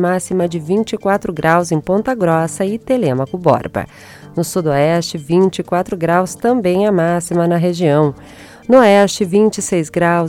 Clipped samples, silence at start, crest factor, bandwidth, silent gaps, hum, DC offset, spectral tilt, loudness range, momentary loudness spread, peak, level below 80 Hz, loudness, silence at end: under 0.1%; 0 s; 14 dB; 16 kHz; none; none; under 0.1%; -6 dB/octave; 3 LU; 6 LU; 0 dBFS; -48 dBFS; -15 LUFS; 0 s